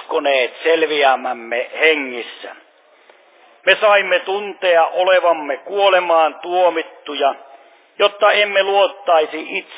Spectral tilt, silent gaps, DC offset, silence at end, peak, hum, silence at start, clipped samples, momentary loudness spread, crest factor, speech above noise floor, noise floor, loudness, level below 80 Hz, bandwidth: -5.5 dB/octave; none; under 0.1%; 0 s; 0 dBFS; none; 0 s; under 0.1%; 11 LU; 16 dB; 34 dB; -50 dBFS; -16 LUFS; -76 dBFS; 4 kHz